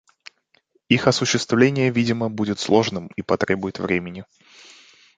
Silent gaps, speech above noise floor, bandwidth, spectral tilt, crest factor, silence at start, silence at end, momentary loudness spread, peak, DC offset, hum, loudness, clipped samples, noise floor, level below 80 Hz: none; 43 dB; 9.4 kHz; -5 dB/octave; 20 dB; 0.9 s; 0.95 s; 8 LU; -2 dBFS; under 0.1%; none; -21 LUFS; under 0.1%; -63 dBFS; -54 dBFS